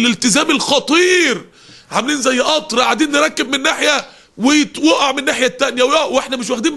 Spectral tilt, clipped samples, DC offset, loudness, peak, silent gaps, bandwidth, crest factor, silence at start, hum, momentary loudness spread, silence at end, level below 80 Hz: -2 dB/octave; under 0.1%; under 0.1%; -14 LUFS; 0 dBFS; none; 12 kHz; 14 dB; 0 s; none; 6 LU; 0 s; -54 dBFS